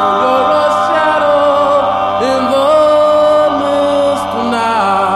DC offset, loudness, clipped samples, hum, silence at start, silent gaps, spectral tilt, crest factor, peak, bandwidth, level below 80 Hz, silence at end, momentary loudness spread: under 0.1%; -11 LUFS; under 0.1%; none; 0 s; none; -4.5 dB/octave; 10 dB; -2 dBFS; 12.5 kHz; -46 dBFS; 0 s; 4 LU